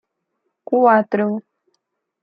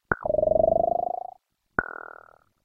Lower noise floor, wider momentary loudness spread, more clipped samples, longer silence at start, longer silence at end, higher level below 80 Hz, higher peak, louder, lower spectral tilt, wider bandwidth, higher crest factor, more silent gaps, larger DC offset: first, -74 dBFS vs -53 dBFS; second, 10 LU vs 19 LU; neither; first, 0.7 s vs 0.1 s; about the same, 0.8 s vs 0.7 s; second, -74 dBFS vs -50 dBFS; about the same, -2 dBFS vs -4 dBFS; first, -17 LUFS vs -25 LUFS; about the same, -10 dB/octave vs -10.5 dB/octave; first, 5.2 kHz vs 2.2 kHz; about the same, 18 dB vs 22 dB; neither; neither